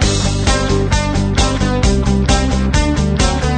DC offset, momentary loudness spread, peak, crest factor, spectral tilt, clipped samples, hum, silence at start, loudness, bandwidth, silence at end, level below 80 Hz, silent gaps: under 0.1%; 1 LU; 0 dBFS; 12 dB; -5 dB/octave; under 0.1%; none; 0 s; -15 LUFS; 9.4 kHz; 0 s; -18 dBFS; none